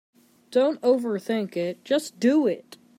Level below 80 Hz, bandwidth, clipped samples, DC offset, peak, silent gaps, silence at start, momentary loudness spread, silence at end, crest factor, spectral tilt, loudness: -78 dBFS; 16 kHz; under 0.1%; under 0.1%; -8 dBFS; none; 0.5 s; 7 LU; 0.4 s; 16 dB; -5.5 dB/octave; -24 LUFS